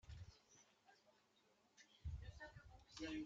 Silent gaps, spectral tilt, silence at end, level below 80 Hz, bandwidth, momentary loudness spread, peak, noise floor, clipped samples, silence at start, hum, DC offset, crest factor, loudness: none; -5 dB/octave; 0 s; -64 dBFS; 8 kHz; 13 LU; -38 dBFS; -79 dBFS; under 0.1%; 0.05 s; none; under 0.1%; 18 dB; -57 LUFS